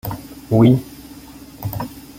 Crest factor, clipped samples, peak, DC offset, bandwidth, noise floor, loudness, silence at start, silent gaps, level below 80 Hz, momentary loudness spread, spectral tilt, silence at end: 18 dB; under 0.1%; -2 dBFS; under 0.1%; 16.5 kHz; -39 dBFS; -17 LUFS; 0.05 s; none; -46 dBFS; 25 LU; -8.5 dB/octave; 0.05 s